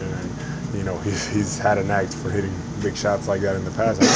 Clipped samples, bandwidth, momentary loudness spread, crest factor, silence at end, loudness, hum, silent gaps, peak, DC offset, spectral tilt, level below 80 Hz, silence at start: under 0.1%; 8 kHz; 8 LU; 20 dB; 0 s; -24 LUFS; none; none; -2 dBFS; under 0.1%; -4.5 dB/octave; -40 dBFS; 0 s